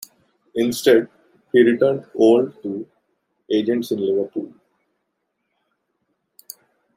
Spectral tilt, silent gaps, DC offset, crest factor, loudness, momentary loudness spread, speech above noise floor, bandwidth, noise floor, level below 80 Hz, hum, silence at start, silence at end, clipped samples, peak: -5.5 dB/octave; none; under 0.1%; 20 dB; -19 LUFS; 24 LU; 57 dB; 16 kHz; -75 dBFS; -70 dBFS; none; 0.55 s; 2.5 s; under 0.1%; -2 dBFS